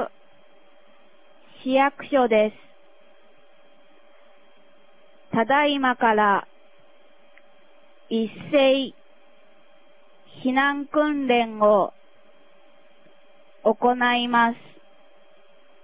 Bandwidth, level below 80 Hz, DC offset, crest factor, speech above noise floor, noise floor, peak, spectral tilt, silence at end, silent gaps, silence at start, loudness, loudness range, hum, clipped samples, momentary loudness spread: 4 kHz; -66 dBFS; 0.4%; 20 dB; 36 dB; -57 dBFS; -6 dBFS; -8.5 dB/octave; 1.3 s; none; 0 s; -22 LUFS; 3 LU; none; under 0.1%; 9 LU